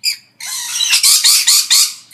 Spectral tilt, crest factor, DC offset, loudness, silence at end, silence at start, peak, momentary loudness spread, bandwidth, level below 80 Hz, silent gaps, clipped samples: 6 dB/octave; 14 dB; under 0.1%; -9 LUFS; 0.15 s; 0.05 s; 0 dBFS; 15 LU; over 20 kHz; -66 dBFS; none; 0.1%